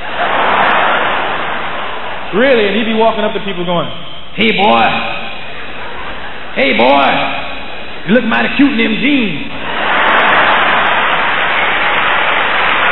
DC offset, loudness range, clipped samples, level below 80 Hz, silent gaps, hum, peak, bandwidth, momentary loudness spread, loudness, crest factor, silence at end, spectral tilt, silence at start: 10%; 4 LU; under 0.1%; -42 dBFS; none; none; 0 dBFS; 5.4 kHz; 15 LU; -12 LUFS; 14 dB; 0 s; -7.5 dB/octave; 0 s